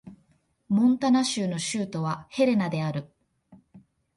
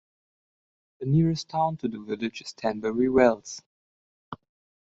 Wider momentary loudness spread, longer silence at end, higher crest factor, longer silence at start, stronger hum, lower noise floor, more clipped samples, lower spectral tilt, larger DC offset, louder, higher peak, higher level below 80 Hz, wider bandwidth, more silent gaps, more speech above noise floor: second, 9 LU vs 23 LU; about the same, 0.4 s vs 0.5 s; second, 16 dB vs 22 dB; second, 0.05 s vs 1 s; neither; second, -66 dBFS vs under -90 dBFS; neither; about the same, -5.5 dB/octave vs -6.5 dB/octave; neither; about the same, -26 LUFS vs -26 LUFS; second, -12 dBFS vs -6 dBFS; second, -66 dBFS vs -58 dBFS; first, 11.5 kHz vs 7.8 kHz; second, none vs 3.66-4.32 s; second, 42 dB vs over 65 dB